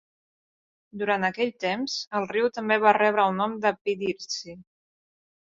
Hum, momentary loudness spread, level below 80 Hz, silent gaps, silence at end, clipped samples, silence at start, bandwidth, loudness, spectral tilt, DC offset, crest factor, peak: none; 12 LU; -72 dBFS; 2.07-2.11 s, 3.81-3.85 s; 0.95 s; under 0.1%; 0.95 s; 7.8 kHz; -25 LUFS; -4 dB/octave; under 0.1%; 22 dB; -4 dBFS